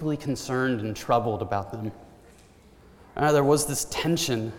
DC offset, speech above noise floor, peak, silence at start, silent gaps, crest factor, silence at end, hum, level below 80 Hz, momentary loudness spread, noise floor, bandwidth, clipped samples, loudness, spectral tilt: under 0.1%; 28 dB; -8 dBFS; 0 s; none; 18 dB; 0 s; none; -54 dBFS; 13 LU; -53 dBFS; 18 kHz; under 0.1%; -26 LUFS; -4.5 dB/octave